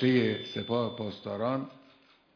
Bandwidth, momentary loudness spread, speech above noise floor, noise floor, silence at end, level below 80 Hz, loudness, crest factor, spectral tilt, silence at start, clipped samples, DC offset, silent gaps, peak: 5.4 kHz; 10 LU; 32 dB; -62 dBFS; 0.6 s; -74 dBFS; -32 LUFS; 18 dB; -7.5 dB/octave; 0 s; under 0.1%; under 0.1%; none; -14 dBFS